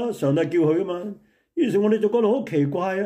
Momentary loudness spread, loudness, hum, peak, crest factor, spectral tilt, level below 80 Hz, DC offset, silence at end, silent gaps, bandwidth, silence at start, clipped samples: 10 LU; -22 LUFS; none; -10 dBFS; 12 dB; -8 dB/octave; -68 dBFS; under 0.1%; 0 s; none; 15 kHz; 0 s; under 0.1%